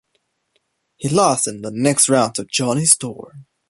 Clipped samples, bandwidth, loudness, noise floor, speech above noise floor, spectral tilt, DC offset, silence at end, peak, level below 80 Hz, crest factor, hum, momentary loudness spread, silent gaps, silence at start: under 0.1%; 16 kHz; -16 LUFS; -69 dBFS; 51 dB; -3.5 dB/octave; under 0.1%; 0.25 s; 0 dBFS; -58 dBFS; 20 dB; none; 12 LU; none; 1 s